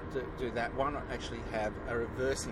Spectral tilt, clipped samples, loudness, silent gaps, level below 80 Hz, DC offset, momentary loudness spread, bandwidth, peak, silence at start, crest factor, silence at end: -5 dB/octave; under 0.1%; -36 LUFS; none; -46 dBFS; under 0.1%; 5 LU; 14.5 kHz; -20 dBFS; 0 s; 16 dB; 0 s